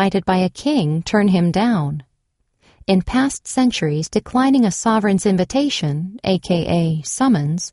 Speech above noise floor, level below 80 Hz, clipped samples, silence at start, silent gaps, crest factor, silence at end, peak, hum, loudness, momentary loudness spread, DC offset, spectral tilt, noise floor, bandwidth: 51 dB; -44 dBFS; under 0.1%; 0 s; none; 16 dB; 0.05 s; -2 dBFS; none; -18 LUFS; 5 LU; under 0.1%; -5.5 dB/octave; -68 dBFS; 11.5 kHz